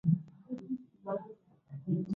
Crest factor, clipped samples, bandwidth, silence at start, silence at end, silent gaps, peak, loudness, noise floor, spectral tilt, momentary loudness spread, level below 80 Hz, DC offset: 20 dB; under 0.1%; 5 kHz; 0.05 s; 0 s; none; -16 dBFS; -39 LUFS; -55 dBFS; -12 dB/octave; 17 LU; -74 dBFS; under 0.1%